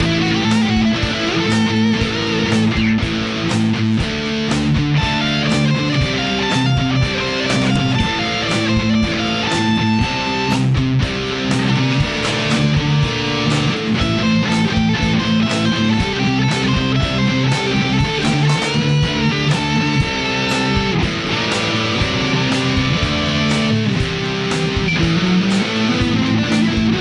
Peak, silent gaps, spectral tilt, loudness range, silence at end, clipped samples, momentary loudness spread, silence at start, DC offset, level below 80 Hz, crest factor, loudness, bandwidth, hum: -4 dBFS; none; -5.5 dB/octave; 1 LU; 0 s; under 0.1%; 2 LU; 0 s; under 0.1%; -34 dBFS; 12 dB; -16 LUFS; 11.5 kHz; none